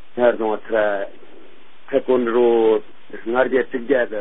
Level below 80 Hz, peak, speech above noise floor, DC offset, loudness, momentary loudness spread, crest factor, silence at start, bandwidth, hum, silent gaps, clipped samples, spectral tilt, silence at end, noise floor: -62 dBFS; -2 dBFS; 31 dB; 3%; -19 LUFS; 10 LU; 18 dB; 0.15 s; 3.9 kHz; none; none; under 0.1%; -10 dB/octave; 0 s; -49 dBFS